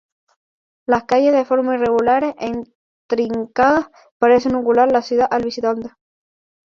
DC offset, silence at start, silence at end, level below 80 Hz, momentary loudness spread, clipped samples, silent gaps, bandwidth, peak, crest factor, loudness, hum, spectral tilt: under 0.1%; 0.9 s; 0.75 s; -54 dBFS; 11 LU; under 0.1%; 2.75-3.09 s, 4.11-4.20 s; 7.2 kHz; -2 dBFS; 16 dB; -17 LUFS; none; -5.5 dB/octave